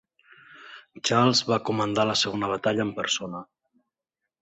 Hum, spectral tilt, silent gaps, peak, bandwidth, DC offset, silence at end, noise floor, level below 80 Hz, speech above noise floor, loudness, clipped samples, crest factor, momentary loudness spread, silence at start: none; -4 dB/octave; none; -8 dBFS; 8.4 kHz; under 0.1%; 0.95 s; -86 dBFS; -64 dBFS; 61 dB; -24 LUFS; under 0.1%; 20 dB; 20 LU; 0.5 s